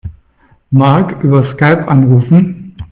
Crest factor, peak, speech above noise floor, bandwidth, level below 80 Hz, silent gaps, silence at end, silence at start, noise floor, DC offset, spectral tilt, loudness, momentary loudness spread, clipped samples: 10 dB; 0 dBFS; 41 dB; 4.3 kHz; -40 dBFS; none; 0.05 s; 0.05 s; -50 dBFS; under 0.1%; -12 dB/octave; -10 LUFS; 9 LU; under 0.1%